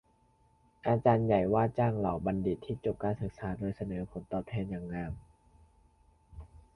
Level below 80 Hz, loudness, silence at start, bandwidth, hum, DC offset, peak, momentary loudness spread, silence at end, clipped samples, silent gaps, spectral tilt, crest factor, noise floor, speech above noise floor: -54 dBFS; -32 LUFS; 0.85 s; 10.5 kHz; none; under 0.1%; -12 dBFS; 13 LU; 0.2 s; under 0.1%; none; -10 dB/octave; 20 dB; -68 dBFS; 36 dB